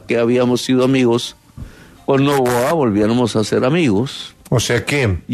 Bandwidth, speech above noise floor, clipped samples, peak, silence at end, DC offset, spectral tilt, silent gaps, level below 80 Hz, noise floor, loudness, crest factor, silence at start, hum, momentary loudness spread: 13.5 kHz; 20 dB; under 0.1%; -2 dBFS; 0 s; under 0.1%; -5.5 dB/octave; none; -42 dBFS; -36 dBFS; -16 LUFS; 14 dB; 0.1 s; none; 6 LU